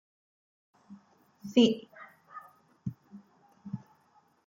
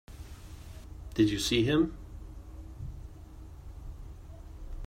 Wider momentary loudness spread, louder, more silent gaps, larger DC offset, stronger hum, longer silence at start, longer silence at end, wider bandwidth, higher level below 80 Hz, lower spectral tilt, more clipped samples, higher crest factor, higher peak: first, 27 LU vs 23 LU; about the same, -30 LUFS vs -28 LUFS; neither; neither; neither; first, 0.9 s vs 0.1 s; first, 0.7 s vs 0 s; second, 7.6 kHz vs 16 kHz; second, -74 dBFS vs -46 dBFS; about the same, -6 dB/octave vs -5 dB/octave; neither; about the same, 24 dB vs 22 dB; about the same, -10 dBFS vs -12 dBFS